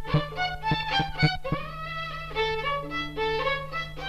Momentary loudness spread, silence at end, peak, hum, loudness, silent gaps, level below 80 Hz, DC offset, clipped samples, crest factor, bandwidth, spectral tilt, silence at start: 8 LU; 0 s; -10 dBFS; 50 Hz at -50 dBFS; -28 LUFS; none; -42 dBFS; under 0.1%; under 0.1%; 18 dB; 14 kHz; -6 dB/octave; 0 s